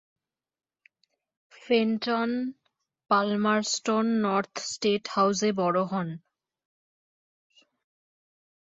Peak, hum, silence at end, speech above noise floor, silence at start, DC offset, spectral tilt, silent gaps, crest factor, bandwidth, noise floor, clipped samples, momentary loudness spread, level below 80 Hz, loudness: -10 dBFS; none; 2.55 s; over 64 dB; 1.65 s; under 0.1%; -4.5 dB/octave; none; 20 dB; 8 kHz; under -90 dBFS; under 0.1%; 8 LU; -74 dBFS; -26 LUFS